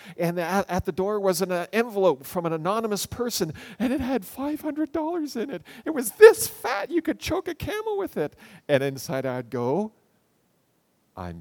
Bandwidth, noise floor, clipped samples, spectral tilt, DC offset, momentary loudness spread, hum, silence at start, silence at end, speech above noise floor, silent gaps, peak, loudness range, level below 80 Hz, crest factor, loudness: 19.5 kHz; -68 dBFS; under 0.1%; -4.5 dB/octave; under 0.1%; 8 LU; none; 0.05 s; 0 s; 44 dB; none; 0 dBFS; 7 LU; -54 dBFS; 26 dB; -25 LUFS